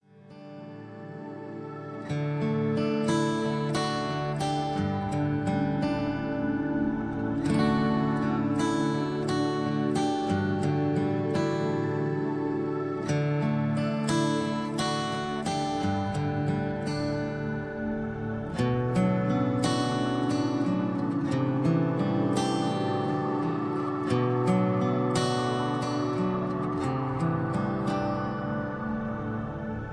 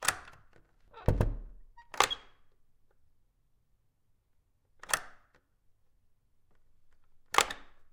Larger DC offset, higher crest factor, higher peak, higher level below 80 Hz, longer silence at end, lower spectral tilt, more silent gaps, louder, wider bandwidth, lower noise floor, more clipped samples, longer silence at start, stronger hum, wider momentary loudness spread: neither; second, 16 dB vs 32 dB; second, -12 dBFS vs -6 dBFS; second, -52 dBFS vs -46 dBFS; about the same, 0 s vs 0.1 s; first, -6.5 dB/octave vs -2.5 dB/octave; neither; first, -28 LUFS vs -32 LUFS; second, 11 kHz vs 16.5 kHz; second, -48 dBFS vs -71 dBFS; neither; first, 0.15 s vs 0 s; neither; second, 7 LU vs 17 LU